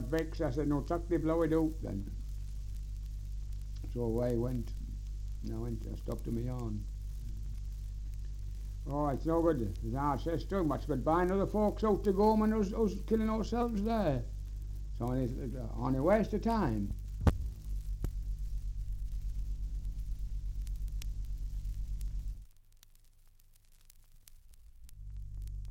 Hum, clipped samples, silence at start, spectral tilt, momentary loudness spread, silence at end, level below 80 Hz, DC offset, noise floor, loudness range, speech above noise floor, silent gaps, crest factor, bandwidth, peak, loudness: none; under 0.1%; 0 s; -8 dB/octave; 14 LU; 0 s; -40 dBFS; under 0.1%; -60 dBFS; 13 LU; 28 dB; none; 20 dB; 16.5 kHz; -14 dBFS; -36 LUFS